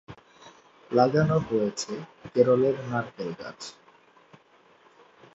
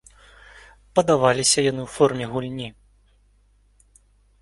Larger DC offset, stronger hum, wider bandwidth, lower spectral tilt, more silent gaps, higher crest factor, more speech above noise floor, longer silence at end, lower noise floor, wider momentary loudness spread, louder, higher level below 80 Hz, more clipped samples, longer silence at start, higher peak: neither; second, none vs 50 Hz at -55 dBFS; second, 8 kHz vs 11.5 kHz; first, -6.5 dB/octave vs -3.5 dB/octave; neither; about the same, 22 dB vs 22 dB; second, 34 dB vs 39 dB; about the same, 1.65 s vs 1.7 s; about the same, -59 dBFS vs -59 dBFS; first, 17 LU vs 14 LU; second, -25 LUFS vs -21 LUFS; second, -62 dBFS vs -54 dBFS; neither; second, 0.1 s vs 0.55 s; second, -6 dBFS vs -2 dBFS